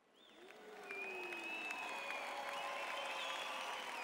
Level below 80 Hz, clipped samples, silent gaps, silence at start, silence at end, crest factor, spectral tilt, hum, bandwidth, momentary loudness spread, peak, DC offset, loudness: -88 dBFS; under 0.1%; none; 0.15 s; 0 s; 18 dB; -0.5 dB/octave; none; 16 kHz; 14 LU; -28 dBFS; under 0.1%; -44 LUFS